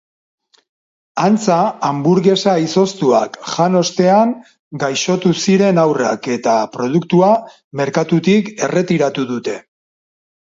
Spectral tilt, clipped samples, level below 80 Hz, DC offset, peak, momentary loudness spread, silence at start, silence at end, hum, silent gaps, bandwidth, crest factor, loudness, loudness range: -5.5 dB/octave; under 0.1%; -62 dBFS; under 0.1%; 0 dBFS; 9 LU; 1.15 s; 0.85 s; none; 4.59-4.71 s, 7.64-7.71 s; 7.8 kHz; 14 dB; -15 LUFS; 2 LU